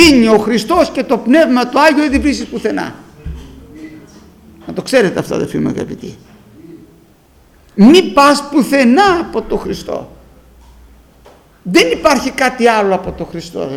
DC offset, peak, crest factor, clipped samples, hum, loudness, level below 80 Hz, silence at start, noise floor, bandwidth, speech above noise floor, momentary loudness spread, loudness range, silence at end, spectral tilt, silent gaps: under 0.1%; 0 dBFS; 14 dB; 0.2%; none; -12 LUFS; -36 dBFS; 0 s; -47 dBFS; 17 kHz; 35 dB; 20 LU; 8 LU; 0 s; -4.5 dB/octave; none